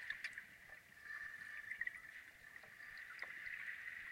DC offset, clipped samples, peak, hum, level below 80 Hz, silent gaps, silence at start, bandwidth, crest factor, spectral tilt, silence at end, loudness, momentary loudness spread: under 0.1%; under 0.1%; -30 dBFS; none; -80 dBFS; none; 0 s; 16 kHz; 22 dB; -1 dB/octave; 0 s; -50 LUFS; 12 LU